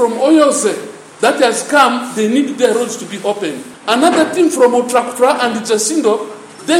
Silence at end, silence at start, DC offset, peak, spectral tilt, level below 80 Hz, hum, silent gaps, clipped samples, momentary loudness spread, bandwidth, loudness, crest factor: 0 s; 0 s; under 0.1%; 0 dBFS; -3 dB/octave; -66 dBFS; none; none; under 0.1%; 10 LU; 16 kHz; -13 LUFS; 14 dB